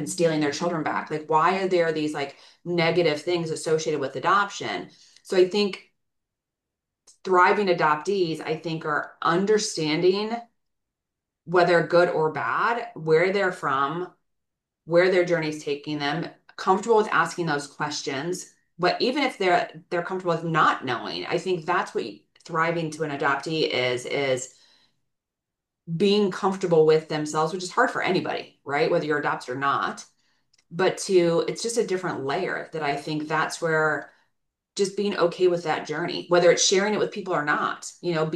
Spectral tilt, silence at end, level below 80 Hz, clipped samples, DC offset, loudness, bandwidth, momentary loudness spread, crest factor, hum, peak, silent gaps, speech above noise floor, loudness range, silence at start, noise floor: -4.5 dB/octave; 0 s; -74 dBFS; under 0.1%; under 0.1%; -24 LUFS; 12.5 kHz; 10 LU; 20 dB; none; -6 dBFS; none; 62 dB; 3 LU; 0 s; -85 dBFS